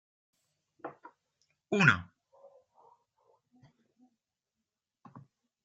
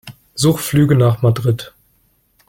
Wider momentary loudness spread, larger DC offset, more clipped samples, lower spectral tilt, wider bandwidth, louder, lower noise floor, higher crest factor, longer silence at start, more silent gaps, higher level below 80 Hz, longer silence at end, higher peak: first, 23 LU vs 14 LU; neither; neither; about the same, -5.5 dB/octave vs -6.5 dB/octave; second, 9 kHz vs 16.5 kHz; second, -27 LUFS vs -15 LUFS; first, -89 dBFS vs -59 dBFS; first, 30 dB vs 14 dB; first, 0.85 s vs 0.05 s; neither; second, -76 dBFS vs -46 dBFS; second, 0.45 s vs 0.8 s; second, -8 dBFS vs -2 dBFS